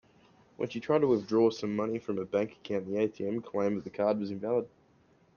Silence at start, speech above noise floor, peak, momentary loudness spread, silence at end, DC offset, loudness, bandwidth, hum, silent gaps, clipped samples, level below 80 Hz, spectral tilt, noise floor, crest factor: 0.6 s; 34 dB; -14 dBFS; 9 LU; 0.7 s; under 0.1%; -31 LUFS; 7 kHz; none; none; under 0.1%; -72 dBFS; -7 dB/octave; -65 dBFS; 18 dB